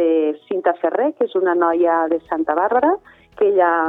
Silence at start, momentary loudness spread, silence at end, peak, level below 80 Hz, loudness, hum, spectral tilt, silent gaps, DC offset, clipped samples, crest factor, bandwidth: 0 s; 5 LU; 0 s; -4 dBFS; -62 dBFS; -18 LUFS; none; -8 dB/octave; none; under 0.1%; under 0.1%; 14 dB; 3.9 kHz